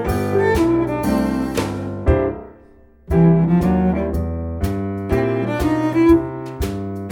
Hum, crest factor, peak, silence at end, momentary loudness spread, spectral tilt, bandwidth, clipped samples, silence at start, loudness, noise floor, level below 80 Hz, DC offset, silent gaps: none; 16 dB; -2 dBFS; 0 s; 11 LU; -8 dB/octave; 20 kHz; under 0.1%; 0 s; -19 LUFS; -47 dBFS; -30 dBFS; under 0.1%; none